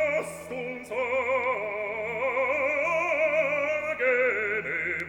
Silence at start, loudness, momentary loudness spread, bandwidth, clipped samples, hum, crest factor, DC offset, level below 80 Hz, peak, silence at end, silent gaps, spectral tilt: 0 s; -27 LUFS; 8 LU; 18 kHz; under 0.1%; none; 14 dB; under 0.1%; -62 dBFS; -14 dBFS; 0 s; none; -4.5 dB/octave